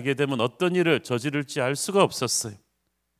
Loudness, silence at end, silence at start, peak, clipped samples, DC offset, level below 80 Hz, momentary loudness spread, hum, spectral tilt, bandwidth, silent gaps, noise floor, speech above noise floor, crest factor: -24 LUFS; 0.65 s; 0 s; -4 dBFS; under 0.1%; under 0.1%; -68 dBFS; 5 LU; none; -4 dB/octave; 16 kHz; none; -75 dBFS; 51 dB; 22 dB